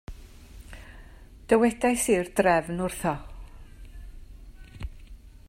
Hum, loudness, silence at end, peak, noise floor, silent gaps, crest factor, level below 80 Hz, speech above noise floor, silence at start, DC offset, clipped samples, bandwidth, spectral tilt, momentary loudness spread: none; -25 LUFS; 0.2 s; -6 dBFS; -47 dBFS; none; 22 dB; -44 dBFS; 23 dB; 0.1 s; under 0.1%; under 0.1%; 16 kHz; -5 dB/octave; 25 LU